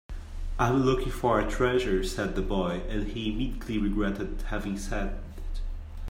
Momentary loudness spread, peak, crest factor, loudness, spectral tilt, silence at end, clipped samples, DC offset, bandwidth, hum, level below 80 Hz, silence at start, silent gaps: 15 LU; -10 dBFS; 18 dB; -29 LUFS; -6 dB/octave; 0 s; under 0.1%; under 0.1%; 16 kHz; none; -34 dBFS; 0.1 s; none